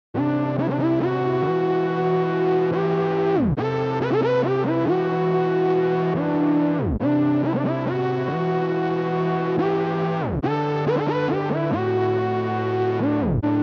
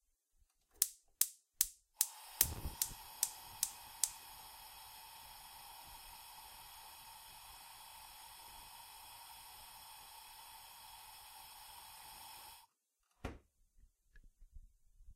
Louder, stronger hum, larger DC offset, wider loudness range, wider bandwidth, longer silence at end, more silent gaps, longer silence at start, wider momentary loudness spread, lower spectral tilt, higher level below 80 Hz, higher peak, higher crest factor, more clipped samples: first, -22 LUFS vs -40 LUFS; neither; neither; second, 2 LU vs 17 LU; second, 6.4 kHz vs 16 kHz; about the same, 0 s vs 0 s; neither; second, 0.15 s vs 0.75 s; second, 3 LU vs 17 LU; first, -9 dB/octave vs -0.5 dB/octave; first, -46 dBFS vs -62 dBFS; second, -10 dBFS vs -6 dBFS; second, 12 dB vs 40 dB; neither